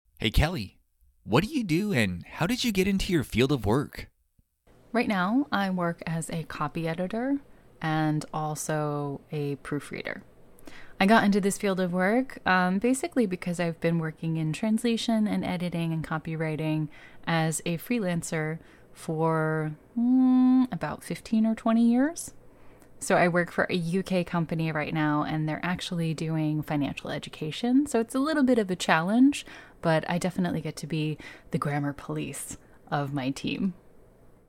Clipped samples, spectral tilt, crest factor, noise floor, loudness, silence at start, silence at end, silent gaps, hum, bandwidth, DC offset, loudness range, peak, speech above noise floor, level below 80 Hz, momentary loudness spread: under 0.1%; -5.5 dB/octave; 22 dB; -68 dBFS; -27 LUFS; 0.2 s; 0.6 s; none; none; 16.5 kHz; under 0.1%; 5 LU; -6 dBFS; 42 dB; -46 dBFS; 11 LU